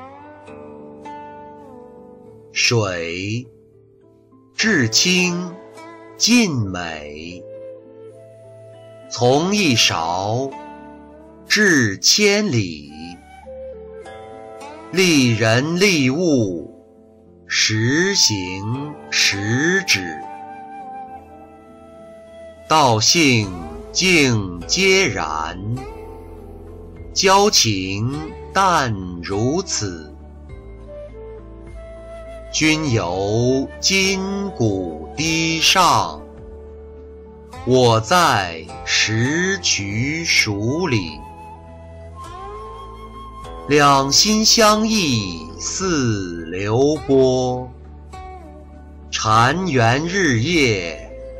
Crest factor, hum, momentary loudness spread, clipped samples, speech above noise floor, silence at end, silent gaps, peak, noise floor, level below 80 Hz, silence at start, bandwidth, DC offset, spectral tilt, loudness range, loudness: 16 dB; none; 24 LU; under 0.1%; 33 dB; 0 s; none; -4 dBFS; -51 dBFS; -42 dBFS; 0 s; 16 kHz; under 0.1%; -3.5 dB/octave; 7 LU; -17 LUFS